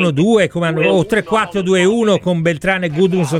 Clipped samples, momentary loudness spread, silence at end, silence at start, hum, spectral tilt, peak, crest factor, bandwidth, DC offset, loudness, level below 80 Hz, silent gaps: under 0.1%; 4 LU; 0 s; 0 s; none; -6 dB/octave; -2 dBFS; 12 dB; 14 kHz; under 0.1%; -14 LUFS; -46 dBFS; none